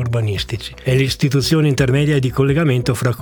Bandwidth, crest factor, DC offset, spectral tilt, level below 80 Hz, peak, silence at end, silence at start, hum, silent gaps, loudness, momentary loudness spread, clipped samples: 19.5 kHz; 16 dB; under 0.1%; -6 dB/octave; -38 dBFS; 0 dBFS; 0 s; 0 s; none; none; -17 LUFS; 6 LU; under 0.1%